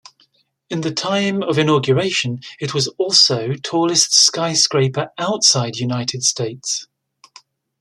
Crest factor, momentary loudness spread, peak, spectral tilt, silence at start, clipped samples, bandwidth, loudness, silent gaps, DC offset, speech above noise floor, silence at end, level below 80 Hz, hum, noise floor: 18 dB; 12 LU; 0 dBFS; -3 dB/octave; 0.7 s; under 0.1%; 13.5 kHz; -16 LUFS; none; under 0.1%; 42 dB; 0.95 s; -60 dBFS; none; -60 dBFS